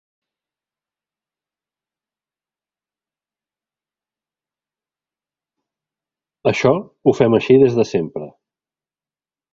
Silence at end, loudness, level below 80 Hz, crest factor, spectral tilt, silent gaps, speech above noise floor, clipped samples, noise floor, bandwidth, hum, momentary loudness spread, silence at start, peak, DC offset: 1.25 s; -16 LUFS; -58 dBFS; 22 dB; -7 dB/octave; none; over 75 dB; under 0.1%; under -90 dBFS; 7.6 kHz; none; 10 LU; 6.45 s; 0 dBFS; under 0.1%